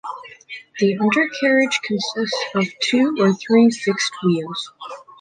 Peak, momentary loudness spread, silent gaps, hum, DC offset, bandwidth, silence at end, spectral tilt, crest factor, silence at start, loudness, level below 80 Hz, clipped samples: -4 dBFS; 19 LU; none; none; under 0.1%; 9.6 kHz; 0.2 s; -4.5 dB/octave; 16 dB; 0.05 s; -19 LUFS; -68 dBFS; under 0.1%